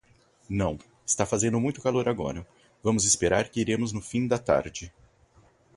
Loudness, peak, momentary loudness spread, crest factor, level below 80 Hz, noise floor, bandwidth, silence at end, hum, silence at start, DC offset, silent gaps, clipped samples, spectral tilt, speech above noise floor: -26 LUFS; -8 dBFS; 14 LU; 20 dB; -50 dBFS; -60 dBFS; 11.5 kHz; 0.85 s; none; 0.5 s; under 0.1%; none; under 0.1%; -4 dB/octave; 34 dB